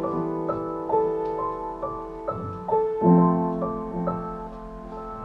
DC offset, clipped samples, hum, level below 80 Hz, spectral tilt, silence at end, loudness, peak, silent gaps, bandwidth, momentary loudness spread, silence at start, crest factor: under 0.1%; under 0.1%; none; -48 dBFS; -11 dB/octave; 0 s; -25 LUFS; -6 dBFS; none; 3.7 kHz; 17 LU; 0 s; 18 dB